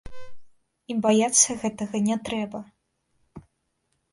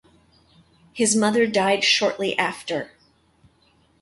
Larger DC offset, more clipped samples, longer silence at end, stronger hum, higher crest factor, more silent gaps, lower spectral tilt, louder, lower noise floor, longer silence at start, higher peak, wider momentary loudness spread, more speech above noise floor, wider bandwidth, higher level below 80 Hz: neither; neither; second, 0.75 s vs 1.15 s; neither; first, 24 dB vs 18 dB; neither; about the same, -3 dB/octave vs -2.5 dB/octave; about the same, -23 LUFS vs -21 LUFS; first, -74 dBFS vs -61 dBFS; second, 0.05 s vs 0.95 s; about the same, -4 dBFS vs -6 dBFS; about the same, 14 LU vs 12 LU; first, 51 dB vs 40 dB; about the same, 11.5 kHz vs 11.5 kHz; first, -56 dBFS vs -66 dBFS